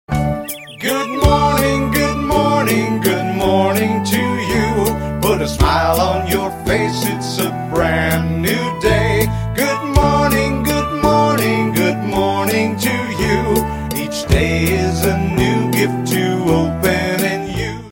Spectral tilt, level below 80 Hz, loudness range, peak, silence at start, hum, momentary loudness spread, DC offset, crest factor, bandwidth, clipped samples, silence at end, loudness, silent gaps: -5.5 dB/octave; -28 dBFS; 2 LU; 0 dBFS; 0.1 s; none; 5 LU; under 0.1%; 16 dB; 17 kHz; under 0.1%; 0 s; -16 LUFS; none